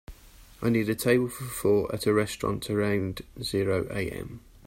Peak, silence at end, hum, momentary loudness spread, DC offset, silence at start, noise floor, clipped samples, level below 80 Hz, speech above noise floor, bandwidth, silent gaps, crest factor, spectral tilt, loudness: -10 dBFS; 0 s; none; 10 LU; under 0.1%; 0.1 s; -50 dBFS; under 0.1%; -50 dBFS; 23 dB; 16 kHz; none; 18 dB; -5.5 dB/octave; -27 LUFS